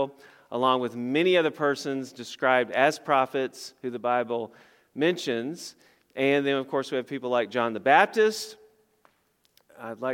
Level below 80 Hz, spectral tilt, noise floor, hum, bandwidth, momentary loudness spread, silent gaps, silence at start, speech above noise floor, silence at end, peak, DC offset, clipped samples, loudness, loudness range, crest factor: -82 dBFS; -4.5 dB/octave; -69 dBFS; none; 16.5 kHz; 16 LU; none; 0 s; 43 dB; 0 s; -4 dBFS; under 0.1%; under 0.1%; -26 LUFS; 4 LU; 22 dB